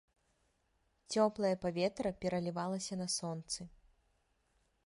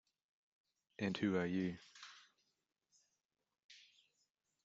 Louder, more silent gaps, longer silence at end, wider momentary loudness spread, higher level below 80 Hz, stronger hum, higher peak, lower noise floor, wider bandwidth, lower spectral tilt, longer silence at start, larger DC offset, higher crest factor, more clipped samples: first, -37 LUFS vs -40 LUFS; second, none vs 3.25-3.29 s, 3.64-3.69 s; first, 1.15 s vs 0.85 s; second, 9 LU vs 24 LU; first, -68 dBFS vs -82 dBFS; neither; first, -18 dBFS vs -26 dBFS; second, -78 dBFS vs -87 dBFS; first, 11.5 kHz vs 7.8 kHz; about the same, -4.5 dB/octave vs -5.5 dB/octave; about the same, 1.1 s vs 1 s; neither; about the same, 20 dB vs 22 dB; neither